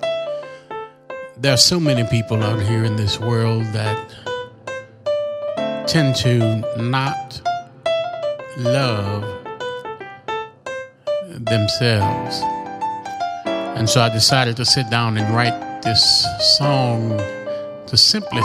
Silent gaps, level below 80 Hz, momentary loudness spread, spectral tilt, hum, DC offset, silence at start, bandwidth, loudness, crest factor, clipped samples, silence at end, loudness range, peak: none; -50 dBFS; 16 LU; -4 dB/octave; none; under 0.1%; 0 s; 15 kHz; -18 LUFS; 20 dB; under 0.1%; 0 s; 8 LU; 0 dBFS